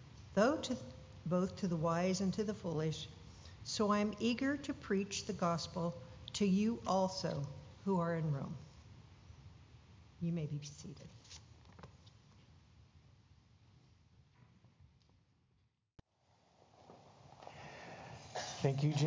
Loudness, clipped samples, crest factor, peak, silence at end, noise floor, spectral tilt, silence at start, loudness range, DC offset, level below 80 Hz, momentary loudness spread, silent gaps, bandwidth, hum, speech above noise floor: -38 LUFS; under 0.1%; 22 dB; -18 dBFS; 0 s; -77 dBFS; -6 dB/octave; 0 s; 17 LU; under 0.1%; -64 dBFS; 23 LU; none; 7.6 kHz; none; 40 dB